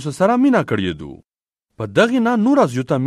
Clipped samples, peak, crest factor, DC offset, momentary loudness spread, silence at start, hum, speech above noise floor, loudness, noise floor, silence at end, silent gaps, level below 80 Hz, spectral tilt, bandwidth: under 0.1%; 0 dBFS; 16 dB; under 0.1%; 15 LU; 0 s; none; 59 dB; -16 LUFS; -75 dBFS; 0 s; none; -52 dBFS; -6.5 dB/octave; 12.5 kHz